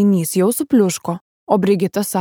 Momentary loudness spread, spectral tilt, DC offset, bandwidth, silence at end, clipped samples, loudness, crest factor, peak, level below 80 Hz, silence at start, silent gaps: 9 LU; -6 dB/octave; under 0.1%; over 20 kHz; 0 s; under 0.1%; -17 LUFS; 16 dB; -2 dBFS; -62 dBFS; 0 s; 1.21-1.47 s